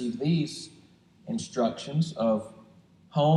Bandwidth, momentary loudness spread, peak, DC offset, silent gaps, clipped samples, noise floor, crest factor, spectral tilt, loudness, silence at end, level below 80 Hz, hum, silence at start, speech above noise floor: 11 kHz; 17 LU; -12 dBFS; under 0.1%; none; under 0.1%; -57 dBFS; 16 dB; -7 dB/octave; -29 LUFS; 0 s; -68 dBFS; none; 0 s; 29 dB